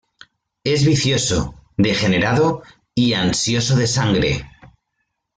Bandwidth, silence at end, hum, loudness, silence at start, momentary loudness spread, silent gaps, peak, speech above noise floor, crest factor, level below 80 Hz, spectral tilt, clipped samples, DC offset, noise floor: 9.6 kHz; 0.7 s; none; -18 LUFS; 0.65 s; 10 LU; none; -4 dBFS; 57 dB; 16 dB; -42 dBFS; -4.5 dB/octave; under 0.1%; under 0.1%; -74 dBFS